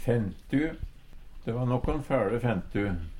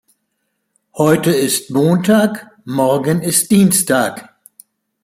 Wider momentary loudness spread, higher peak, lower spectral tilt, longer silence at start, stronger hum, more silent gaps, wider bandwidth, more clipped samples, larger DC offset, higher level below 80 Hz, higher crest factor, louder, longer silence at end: about the same, 10 LU vs 9 LU; second, -14 dBFS vs 0 dBFS; first, -8.5 dB/octave vs -4.5 dB/octave; second, 0 s vs 0.95 s; neither; neither; second, 13 kHz vs 16.5 kHz; neither; neither; first, -40 dBFS vs -56 dBFS; about the same, 16 dB vs 16 dB; second, -30 LUFS vs -14 LUFS; second, 0 s vs 0.8 s